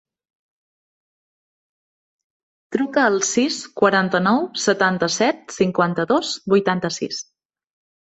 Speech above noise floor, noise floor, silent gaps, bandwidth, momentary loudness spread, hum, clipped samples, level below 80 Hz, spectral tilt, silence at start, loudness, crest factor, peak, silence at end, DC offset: over 71 dB; under -90 dBFS; none; 8.2 kHz; 7 LU; none; under 0.1%; -62 dBFS; -4 dB/octave; 2.7 s; -19 LUFS; 20 dB; -2 dBFS; 0.8 s; under 0.1%